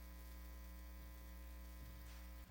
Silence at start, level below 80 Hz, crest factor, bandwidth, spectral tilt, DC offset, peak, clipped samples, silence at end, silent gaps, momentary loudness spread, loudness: 0 s; -54 dBFS; 10 dB; 17 kHz; -5 dB/octave; under 0.1%; -44 dBFS; under 0.1%; 0 s; none; 1 LU; -57 LUFS